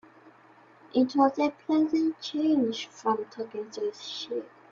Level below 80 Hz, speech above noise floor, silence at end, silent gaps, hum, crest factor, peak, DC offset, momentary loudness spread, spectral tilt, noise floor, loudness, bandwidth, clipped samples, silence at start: -74 dBFS; 29 dB; 0.25 s; none; none; 20 dB; -8 dBFS; under 0.1%; 12 LU; -4.5 dB/octave; -56 dBFS; -28 LUFS; 7.4 kHz; under 0.1%; 0.25 s